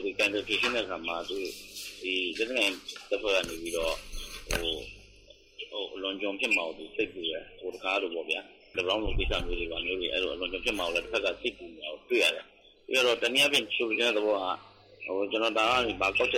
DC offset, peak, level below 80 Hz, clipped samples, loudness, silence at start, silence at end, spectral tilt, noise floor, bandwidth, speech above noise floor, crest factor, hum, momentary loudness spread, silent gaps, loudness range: under 0.1%; -14 dBFS; -46 dBFS; under 0.1%; -29 LUFS; 0 s; 0 s; -2.5 dB/octave; -56 dBFS; 16 kHz; 26 dB; 16 dB; none; 13 LU; none; 6 LU